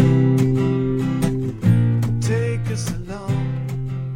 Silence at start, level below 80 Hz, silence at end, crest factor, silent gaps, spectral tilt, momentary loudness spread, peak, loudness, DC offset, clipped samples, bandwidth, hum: 0 s; -36 dBFS; 0 s; 14 dB; none; -7.5 dB/octave; 9 LU; -4 dBFS; -20 LUFS; under 0.1%; under 0.1%; 15 kHz; none